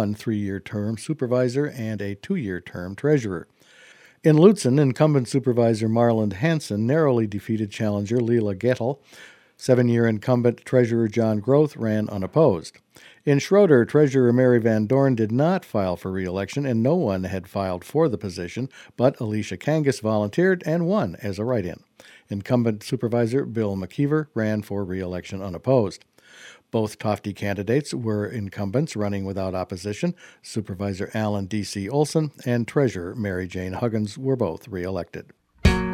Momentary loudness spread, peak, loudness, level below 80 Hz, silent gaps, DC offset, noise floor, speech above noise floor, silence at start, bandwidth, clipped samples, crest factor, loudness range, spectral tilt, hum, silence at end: 11 LU; -2 dBFS; -23 LUFS; -44 dBFS; none; under 0.1%; -52 dBFS; 29 dB; 0 s; 15.5 kHz; under 0.1%; 22 dB; 7 LU; -7 dB/octave; none; 0 s